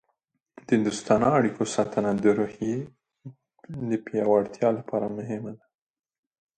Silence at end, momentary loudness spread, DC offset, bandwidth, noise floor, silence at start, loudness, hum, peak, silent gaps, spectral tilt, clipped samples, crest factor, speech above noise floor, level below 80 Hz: 1 s; 12 LU; under 0.1%; 9.2 kHz; -77 dBFS; 0.7 s; -26 LUFS; none; -6 dBFS; none; -6 dB/octave; under 0.1%; 20 dB; 52 dB; -62 dBFS